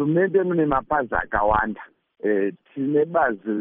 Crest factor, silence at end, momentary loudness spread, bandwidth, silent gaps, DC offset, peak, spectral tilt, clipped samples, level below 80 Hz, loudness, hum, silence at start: 16 dB; 0 s; 9 LU; 3.7 kHz; none; under 0.1%; -6 dBFS; -6.5 dB/octave; under 0.1%; -44 dBFS; -22 LUFS; none; 0 s